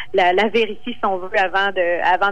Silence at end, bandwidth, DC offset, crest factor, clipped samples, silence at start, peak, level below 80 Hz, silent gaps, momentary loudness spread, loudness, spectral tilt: 0 s; 9.6 kHz; 3%; 12 dB; under 0.1%; 0 s; -6 dBFS; -54 dBFS; none; 7 LU; -18 LUFS; -4.5 dB/octave